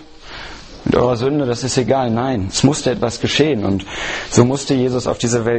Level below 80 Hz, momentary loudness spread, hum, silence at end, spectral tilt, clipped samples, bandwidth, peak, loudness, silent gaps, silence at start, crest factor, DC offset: -40 dBFS; 11 LU; none; 0 s; -5 dB/octave; under 0.1%; 8.8 kHz; 0 dBFS; -17 LUFS; none; 0 s; 16 dB; under 0.1%